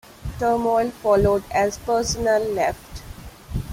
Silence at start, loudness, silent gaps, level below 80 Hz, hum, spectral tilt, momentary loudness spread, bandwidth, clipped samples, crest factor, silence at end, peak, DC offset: 0.2 s; -21 LUFS; none; -38 dBFS; none; -5 dB/octave; 19 LU; 16.5 kHz; under 0.1%; 16 dB; 0 s; -6 dBFS; under 0.1%